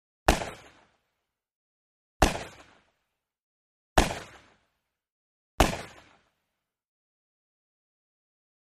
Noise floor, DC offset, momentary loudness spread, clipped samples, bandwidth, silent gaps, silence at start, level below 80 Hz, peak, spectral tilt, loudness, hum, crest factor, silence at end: -84 dBFS; under 0.1%; 20 LU; under 0.1%; 15 kHz; 1.55-2.20 s, 3.42-3.96 s, 5.10-5.58 s; 0.3 s; -40 dBFS; -6 dBFS; -4 dB/octave; -28 LUFS; none; 28 dB; 2.75 s